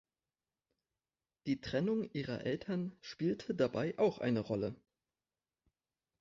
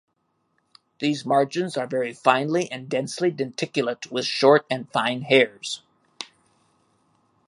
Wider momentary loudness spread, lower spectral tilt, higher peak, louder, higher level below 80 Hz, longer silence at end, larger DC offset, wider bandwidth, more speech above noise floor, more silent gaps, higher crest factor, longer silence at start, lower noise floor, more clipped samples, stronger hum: second, 7 LU vs 14 LU; first, -6 dB/octave vs -4.5 dB/octave; second, -18 dBFS vs -2 dBFS; second, -37 LUFS vs -23 LUFS; about the same, -70 dBFS vs -74 dBFS; first, 1.45 s vs 1.25 s; neither; second, 7.4 kHz vs 11.5 kHz; first, over 54 dB vs 49 dB; neither; about the same, 20 dB vs 22 dB; first, 1.45 s vs 1 s; first, under -90 dBFS vs -72 dBFS; neither; neither